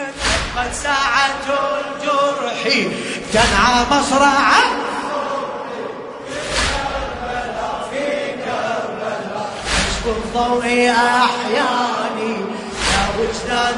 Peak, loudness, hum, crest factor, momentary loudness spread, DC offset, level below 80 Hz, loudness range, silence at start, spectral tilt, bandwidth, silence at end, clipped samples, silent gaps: 0 dBFS; -18 LUFS; none; 18 dB; 11 LU; under 0.1%; -34 dBFS; 7 LU; 0 s; -3 dB/octave; 11 kHz; 0 s; under 0.1%; none